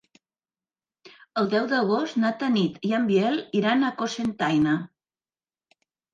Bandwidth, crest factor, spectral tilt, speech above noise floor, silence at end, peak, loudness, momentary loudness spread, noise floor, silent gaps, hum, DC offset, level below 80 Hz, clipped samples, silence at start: 9 kHz; 16 dB; -6 dB/octave; over 67 dB; 1.3 s; -10 dBFS; -24 LUFS; 6 LU; under -90 dBFS; none; none; under 0.1%; -66 dBFS; under 0.1%; 1.05 s